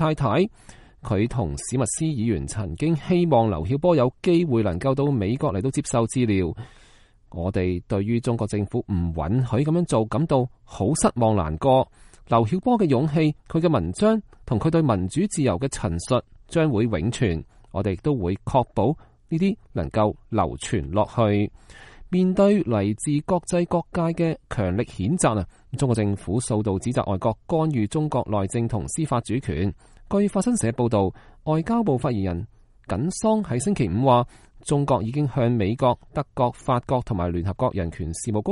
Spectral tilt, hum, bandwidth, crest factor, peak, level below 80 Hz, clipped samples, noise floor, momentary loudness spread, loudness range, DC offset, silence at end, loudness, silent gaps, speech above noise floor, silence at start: -6.5 dB/octave; none; 11.5 kHz; 18 dB; -4 dBFS; -44 dBFS; under 0.1%; -53 dBFS; 7 LU; 3 LU; under 0.1%; 0 s; -23 LUFS; none; 31 dB; 0 s